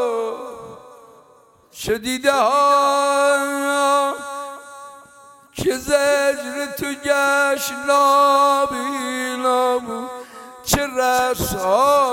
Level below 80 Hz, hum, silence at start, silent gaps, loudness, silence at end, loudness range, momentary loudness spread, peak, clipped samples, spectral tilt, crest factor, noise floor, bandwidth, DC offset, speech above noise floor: -46 dBFS; none; 0 s; none; -18 LUFS; 0 s; 4 LU; 17 LU; -2 dBFS; under 0.1%; -3 dB/octave; 18 dB; -52 dBFS; 17 kHz; under 0.1%; 34 dB